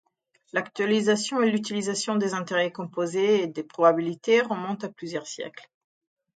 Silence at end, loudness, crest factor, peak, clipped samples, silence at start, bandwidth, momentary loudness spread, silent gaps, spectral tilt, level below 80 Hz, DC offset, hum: 0.75 s; -25 LUFS; 20 dB; -6 dBFS; under 0.1%; 0.55 s; 9.4 kHz; 11 LU; none; -4.5 dB/octave; -76 dBFS; under 0.1%; none